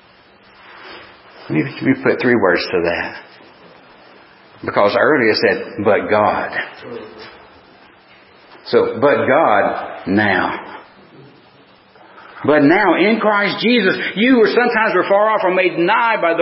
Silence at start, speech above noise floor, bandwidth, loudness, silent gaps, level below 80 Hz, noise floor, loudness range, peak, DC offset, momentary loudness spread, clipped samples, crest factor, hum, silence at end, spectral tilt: 0.7 s; 33 dB; 5.8 kHz; -15 LUFS; none; -54 dBFS; -48 dBFS; 6 LU; 0 dBFS; under 0.1%; 16 LU; under 0.1%; 16 dB; none; 0 s; -9.5 dB/octave